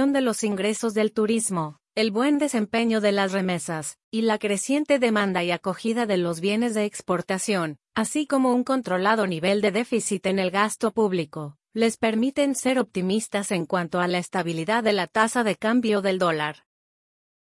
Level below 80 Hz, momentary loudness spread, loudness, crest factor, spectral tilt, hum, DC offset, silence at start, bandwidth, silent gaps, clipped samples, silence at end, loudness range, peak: -68 dBFS; 5 LU; -24 LUFS; 18 dB; -4.5 dB/octave; none; under 0.1%; 0 s; 12 kHz; 4.04-4.11 s; under 0.1%; 0.95 s; 1 LU; -6 dBFS